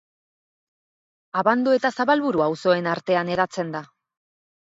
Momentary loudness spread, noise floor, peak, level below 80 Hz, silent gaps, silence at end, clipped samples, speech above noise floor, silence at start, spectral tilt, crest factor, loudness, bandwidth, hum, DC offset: 9 LU; under -90 dBFS; -4 dBFS; -66 dBFS; none; 0.85 s; under 0.1%; over 69 dB; 1.35 s; -6 dB/octave; 20 dB; -22 LUFS; 7.8 kHz; none; under 0.1%